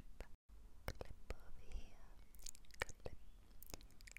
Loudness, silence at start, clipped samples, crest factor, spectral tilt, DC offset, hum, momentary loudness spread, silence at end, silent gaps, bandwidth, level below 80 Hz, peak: -56 LUFS; 0 s; under 0.1%; 32 dB; -3.5 dB/octave; under 0.1%; none; 17 LU; 0 s; 0.35-0.49 s; 16.5 kHz; -56 dBFS; -20 dBFS